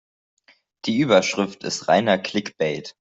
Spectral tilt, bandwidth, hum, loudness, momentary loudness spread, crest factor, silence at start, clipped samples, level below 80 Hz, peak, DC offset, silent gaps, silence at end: -4.5 dB/octave; 8.2 kHz; none; -21 LUFS; 9 LU; 20 dB; 0.85 s; under 0.1%; -64 dBFS; -4 dBFS; under 0.1%; none; 0.1 s